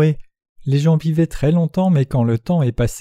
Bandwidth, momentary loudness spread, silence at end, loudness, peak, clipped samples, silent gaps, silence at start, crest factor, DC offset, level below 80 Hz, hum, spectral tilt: 13 kHz; 4 LU; 0 s; -17 LUFS; -4 dBFS; under 0.1%; 0.49-0.56 s; 0 s; 14 dB; under 0.1%; -36 dBFS; none; -8 dB/octave